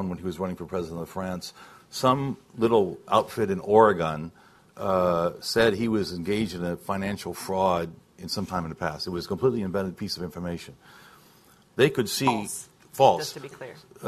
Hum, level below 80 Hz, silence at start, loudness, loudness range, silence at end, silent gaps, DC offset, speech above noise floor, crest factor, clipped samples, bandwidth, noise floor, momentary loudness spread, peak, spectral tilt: none; -52 dBFS; 0 s; -26 LUFS; 6 LU; 0 s; none; under 0.1%; 31 dB; 22 dB; under 0.1%; 14 kHz; -57 dBFS; 16 LU; -4 dBFS; -5 dB/octave